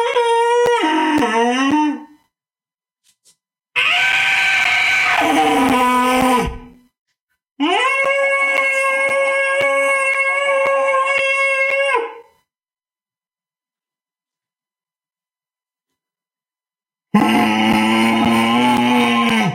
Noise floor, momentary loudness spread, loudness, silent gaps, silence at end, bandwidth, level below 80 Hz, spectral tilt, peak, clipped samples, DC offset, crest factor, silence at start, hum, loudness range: under -90 dBFS; 4 LU; -15 LUFS; 6.99-7.06 s, 7.22-7.27 s, 7.51-7.55 s; 0 s; 16.5 kHz; -46 dBFS; -4 dB/octave; 0 dBFS; under 0.1%; under 0.1%; 16 dB; 0 s; none; 6 LU